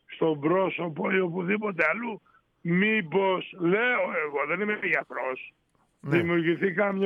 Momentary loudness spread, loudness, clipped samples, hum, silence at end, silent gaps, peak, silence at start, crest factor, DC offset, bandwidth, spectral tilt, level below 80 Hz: 10 LU; -26 LUFS; under 0.1%; none; 0 s; none; -10 dBFS; 0.1 s; 18 dB; under 0.1%; 5.6 kHz; -8.5 dB/octave; -72 dBFS